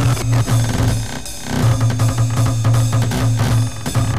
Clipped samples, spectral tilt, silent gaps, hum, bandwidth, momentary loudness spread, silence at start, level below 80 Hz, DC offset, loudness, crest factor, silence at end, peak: under 0.1%; -5.5 dB/octave; none; none; 15.5 kHz; 5 LU; 0 s; -30 dBFS; 3%; -17 LUFS; 12 dB; 0 s; -4 dBFS